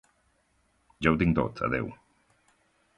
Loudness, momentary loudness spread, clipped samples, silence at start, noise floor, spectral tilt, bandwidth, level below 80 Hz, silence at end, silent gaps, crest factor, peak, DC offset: -28 LUFS; 8 LU; under 0.1%; 1 s; -70 dBFS; -8 dB/octave; 10.5 kHz; -48 dBFS; 1.05 s; none; 24 dB; -8 dBFS; under 0.1%